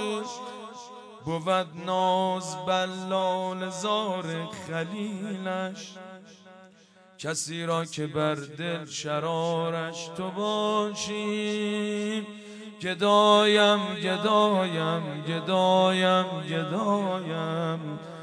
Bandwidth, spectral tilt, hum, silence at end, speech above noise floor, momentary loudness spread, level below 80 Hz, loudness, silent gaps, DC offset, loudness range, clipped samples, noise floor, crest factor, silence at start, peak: 11 kHz; -4.5 dB/octave; none; 0 s; 29 dB; 14 LU; -74 dBFS; -27 LUFS; none; under 0.1%; 9 LU; under 0.1%; -56 dBFS; 20 dB; 0 s; -6 dBFS